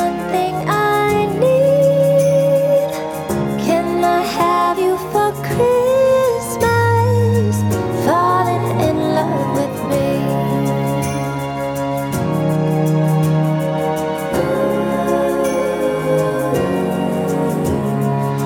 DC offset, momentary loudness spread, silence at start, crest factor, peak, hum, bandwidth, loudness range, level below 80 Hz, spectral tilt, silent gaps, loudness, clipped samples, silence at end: under 0.1%; 6 LU; 0 s; 14 dB; -2 dBFS; none; 18 kHz; 3 LU; -46 dBFS; -6.5 dB/octave; none; -16 LUFS; under 0.1%; 0 s